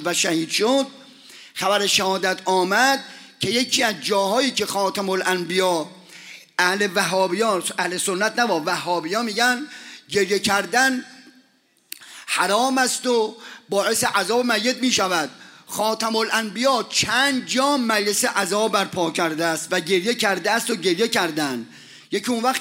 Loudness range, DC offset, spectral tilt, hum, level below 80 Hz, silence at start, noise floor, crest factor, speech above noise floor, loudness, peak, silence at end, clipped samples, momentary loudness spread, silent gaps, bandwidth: 2 LU; under 0.1%; -2.5 dB/octave; none; -66 dBFS; 0 s; -61 dBFS; 18 dB; 40 dB; -20 LUFS; -4 dBFS; 0 s; under 0.1%; 9 LU; none; 16 kHz